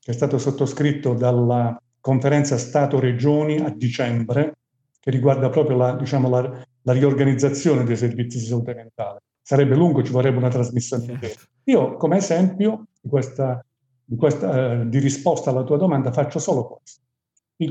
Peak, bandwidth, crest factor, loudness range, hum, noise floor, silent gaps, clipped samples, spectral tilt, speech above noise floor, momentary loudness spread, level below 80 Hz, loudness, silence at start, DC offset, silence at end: -4 dBFS; 8.4 kHz; 16 dB; 2 LU; none; -72 dBFS; none; under 0.1%; -7 dB/octave; 53 dB; 11 LU; -70 dBFS; -20 LUFS; 0.1 s; under 0.1%; 0 s